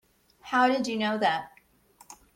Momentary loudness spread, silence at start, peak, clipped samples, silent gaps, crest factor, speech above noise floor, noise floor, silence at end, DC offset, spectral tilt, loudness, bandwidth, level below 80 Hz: 9 LU; 0.45 s; -10 dBFS; under 0.1%; none; 18 dB; 34 dB; -60 dBFS; 0.2 s; under 0.1%; -4 dB/octave; -26 LUFS; 16.5 kHz; -70 dBFS